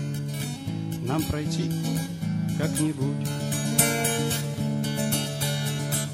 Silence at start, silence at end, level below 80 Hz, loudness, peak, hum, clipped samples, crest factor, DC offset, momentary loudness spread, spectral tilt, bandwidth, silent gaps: 0 s; 0 s; -50 dBFS; -26 LUFS; -4 dBFS; none; under 0.1%; 22 dB; under 0.1%; 9 LU; -4.5 dB/octave; 16.5 kHz; none